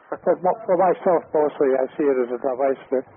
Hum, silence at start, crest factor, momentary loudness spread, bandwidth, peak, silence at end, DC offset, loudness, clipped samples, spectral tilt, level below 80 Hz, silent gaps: none; 0.1 s; 14 dB; 5 LU; 3.6 kHz; -8 dBFS; 0.15 s; under 0.1%; -21 LUFS; under 0.1%; -2 dB/octave; -68 dBFS; none